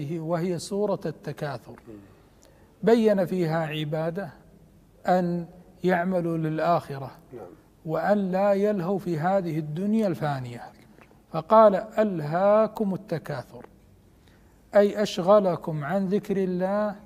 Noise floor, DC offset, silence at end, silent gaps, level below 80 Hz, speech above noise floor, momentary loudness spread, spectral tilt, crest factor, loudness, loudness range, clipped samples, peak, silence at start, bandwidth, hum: -56 dBFS; under 0.1%; 0 s; none; -62 dBFS; 31 dB; 17 LU; -7 dB/octave; 20 dB; -25 LUFS; 4 LU; under 0.1%; -6 dBFS; 0 s; 15 kHz; none